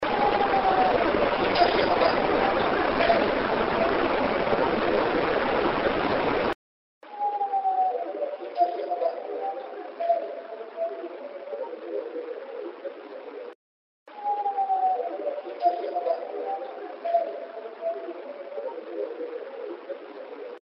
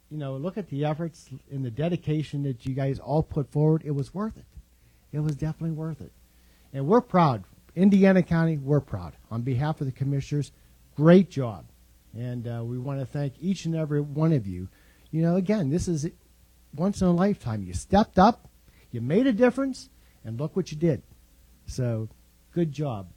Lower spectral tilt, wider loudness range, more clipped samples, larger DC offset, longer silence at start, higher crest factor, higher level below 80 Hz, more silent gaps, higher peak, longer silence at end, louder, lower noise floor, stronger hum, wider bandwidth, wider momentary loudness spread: second, -2.5 dB/octave vs -8 dB/octave; first, 12 LU vs 6 LU; neither; neither; about the same, 0 s vs 0.1 s; about the same, 22 dB vs 20 dB; about the same, -52 dBFS vs -50 dBFS; first, 6.55-7.01 s, 13.55-14.06 s vs none; about the same, -6 dBFS vs -6 dBFS; about the same, 0.05 s vs 0.05 s; about the same, -26 LUFS vs -26 LUFS; first, under -90 dBFS vs -59 dBFS; neither; second, 5.8 kHz vs 11 kHz; about the same, 16 LU vs 17 LU